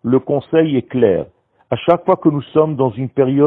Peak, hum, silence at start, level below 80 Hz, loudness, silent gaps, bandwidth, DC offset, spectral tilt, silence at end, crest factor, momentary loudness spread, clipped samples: 0 dBFS; none; 0.05 s; -54 dBFS; -16 LUFS; none; 4 kHz; under 0.1%; -10.5 dB/octave; 0 s; 16 dB; 6 LU; under 0.1%